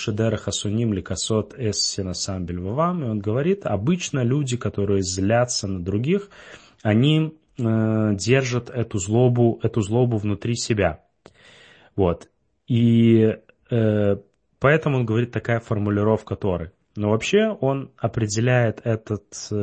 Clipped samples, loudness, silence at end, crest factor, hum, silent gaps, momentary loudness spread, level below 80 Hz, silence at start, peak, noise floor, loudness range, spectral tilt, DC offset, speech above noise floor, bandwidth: under 0.1%; -22 LUFS; 0 s; 18 dB; none; none; 9 LU; -50 dBFS; 0 s; -2 dBFS; -51 dBFS; 3 LU; -6 dB/octave; under 0.1%; 30 dB; 8.8 kHz